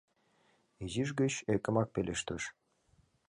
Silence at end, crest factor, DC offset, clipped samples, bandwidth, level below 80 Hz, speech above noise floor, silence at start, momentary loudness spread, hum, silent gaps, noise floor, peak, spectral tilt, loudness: 0.8 s; 20 dB; under 0.1%; under 0.1%; 11 kHz; -60 dBFS; 38 dB; 0.8 s; 9 LU; none; none; -72 dBFS; -16 dBFS; -5 dB/octave; -35 LUFS